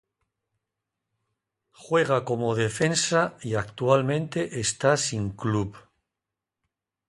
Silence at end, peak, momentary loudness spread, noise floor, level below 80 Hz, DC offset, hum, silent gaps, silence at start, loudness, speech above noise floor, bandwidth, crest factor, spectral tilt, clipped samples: 1.3 s; -4 dBFS; 7 LU; -87 dBFS; -56 dBFS; under 0.1%; none; none; 1.8 s; -25 LUFS; 62 dB; 11.5 kHz; 22 dB; -4.5 dB/octave; under 0.1%